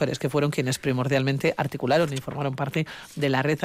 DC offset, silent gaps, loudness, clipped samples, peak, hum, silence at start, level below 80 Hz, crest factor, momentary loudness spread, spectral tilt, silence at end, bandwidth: under 0.1%; none; -25 LUFS; under 0.1%; -10 dBFS; none; 0 s; -60 dBFS; 14 dB; 6 LU; -6 dB/octave; 0 s; 16 kHz